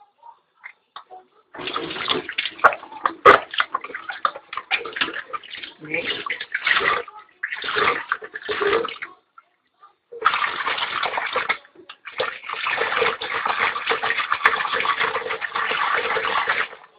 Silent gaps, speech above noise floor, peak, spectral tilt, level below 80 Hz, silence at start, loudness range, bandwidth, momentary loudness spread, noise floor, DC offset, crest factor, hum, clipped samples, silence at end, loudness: none; 29 dB; 0 dBFS; -4 dB/octave; -60 dBFS; 0.25 s; 5 LU; 9.8 kHz; 13 LU; -55 dBFS; under 0.1%; 24 dB; none; under 0.1%; 0.2 s; -22 LUFS